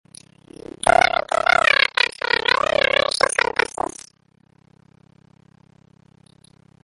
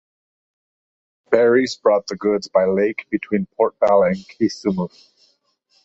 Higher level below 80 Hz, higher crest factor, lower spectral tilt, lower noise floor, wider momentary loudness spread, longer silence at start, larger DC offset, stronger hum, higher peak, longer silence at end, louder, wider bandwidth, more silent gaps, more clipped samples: first, -50 dBFS vs -58 dBFS; about the same, 22 dB vs 18 dB; second, -1.5 dB/octave vs -6 dB/octave; second, -58 dBFS vs -63 dBFS; first, 12 LU vs 8 LU; second, 0.85 s vs 1.3 s; neither; neither; about the same, 0 dBFS vs -2 dBFS; first, 3.55 s vs 0.95 s; about the same, -18 LUFS vs -19 LUFS; first, 11.5 kHz vs 8 kHz; neither; neither